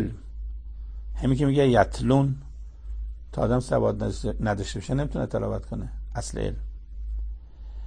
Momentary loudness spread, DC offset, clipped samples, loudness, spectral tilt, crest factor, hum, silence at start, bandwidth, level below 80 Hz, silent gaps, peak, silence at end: 18 LU; under 0.1%; under 0.1%; -26 LUFS; -7 dB/octave; 20 dB; none; 0 s; 9.8 kHz; -36 dBFS; none; -6 dBFS; 0 s